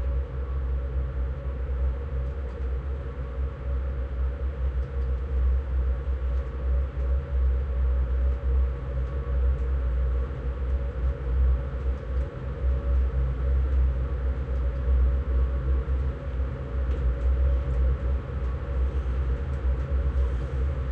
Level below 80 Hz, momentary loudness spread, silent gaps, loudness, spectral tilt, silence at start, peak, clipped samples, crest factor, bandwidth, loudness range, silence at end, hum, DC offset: -26 dBFS; 6 LU; none; -29 LUFS; -9.5 dB/octave; 0 s; -14 dBFS; under 0.1%; 10 dB; 3.5 kHz; 4 LU; 0 s; none; under 0.1%